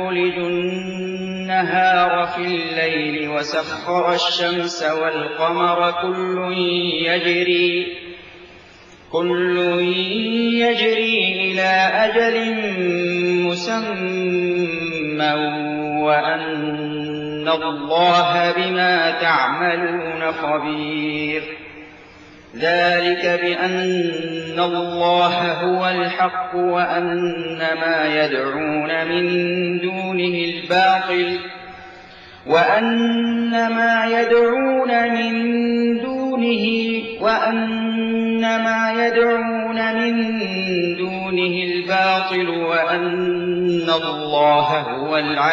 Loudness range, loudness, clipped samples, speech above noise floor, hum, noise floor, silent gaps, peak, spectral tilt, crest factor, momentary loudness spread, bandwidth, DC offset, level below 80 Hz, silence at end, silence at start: 3 LU; -19 LUFS; under 0.1%; 26 dB; none; -44 dBFS; none; -4 dBFS; -5.5 dB/octave; 16 dB; 7 LU; 7.4 kHz; under 0.1%; -60 dBFS; 0 s; 0 s